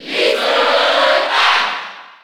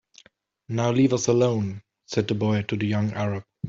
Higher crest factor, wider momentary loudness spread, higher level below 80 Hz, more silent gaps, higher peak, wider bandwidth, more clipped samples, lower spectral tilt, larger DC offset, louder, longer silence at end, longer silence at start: about the same, 14 dB vs 18 dB; about the same, 9 LU vs 9 LU; second, -66 dBFS vs -60 dBFS; neither; first, -2 dBFS vs -8 dBFS; first, 18 kHz vs 7.8 kHz; neither; second, -0.5 dB/octave vs -6 dB/octave; first, 0.5% vs under 0.1%; first, -13 LUFS vs -24 LUFS; about the same, 0.1 s vs 0 s; second, 0 s vs 0.7 s